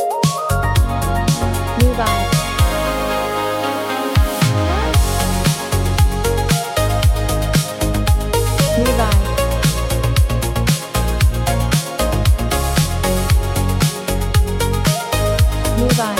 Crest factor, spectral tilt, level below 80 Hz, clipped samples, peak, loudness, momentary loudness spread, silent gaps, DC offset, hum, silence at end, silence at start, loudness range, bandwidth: 14 dB; -5 dB/octave; -20 dBFS; under 0.1%; -2 dBFS; -17 LUFS; 3 LU; none; under 0.1%; none; 0 s; 0 s; 1 LU; 16.5 kHz